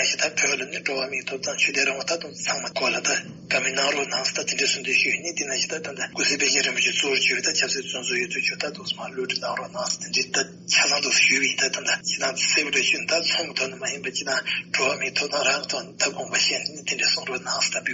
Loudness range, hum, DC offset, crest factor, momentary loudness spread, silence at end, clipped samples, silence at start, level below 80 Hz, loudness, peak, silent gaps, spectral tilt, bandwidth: 4 LU; none; under 0.1%; 18 dB; 8 LU; 0 s; under 0.1%; 0 s; -70 dBFS; -22 LUFS; -6 dBFS; none; 0.5 dB/octave; 8 kHz